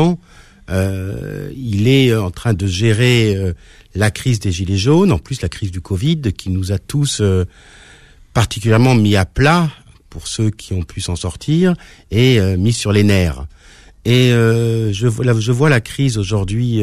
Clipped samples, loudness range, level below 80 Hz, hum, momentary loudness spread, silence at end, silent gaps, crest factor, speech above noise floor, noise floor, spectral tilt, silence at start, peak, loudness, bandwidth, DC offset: under 0.1%; 3 LU; -36 dBFS; none; 12 LU; 0 s; none; 12 dB; 29 dB; -43 dBFS; -6 dB/octave; 0 s; -2 dBFS; -16 LUFS; 14.5 kHz; under 0.1%